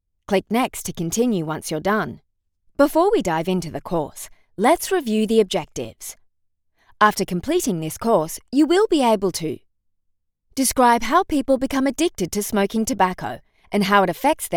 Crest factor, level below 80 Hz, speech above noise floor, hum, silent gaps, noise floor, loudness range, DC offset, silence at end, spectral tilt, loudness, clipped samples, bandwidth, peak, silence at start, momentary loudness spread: 20 dB; -48 dBFS; 49 dB; none; none; -69 dBFS; 3 LU; under 0.1%; 0 s; -4.5 dB/octave; -20 LUFS; under 0.1%; over 20 kHz; -2 dBFS; 0.3 s; 14 LU